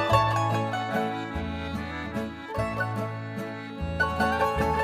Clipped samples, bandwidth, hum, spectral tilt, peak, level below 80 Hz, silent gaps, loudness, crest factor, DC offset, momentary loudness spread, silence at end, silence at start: under 0.1%; 16 kHz; none; -6 dB/octave; -8 dBFS; -44 dBFS; none; -28 LUFS; 20 dB; under 0.1%; 10 LU; 0 s; 0 s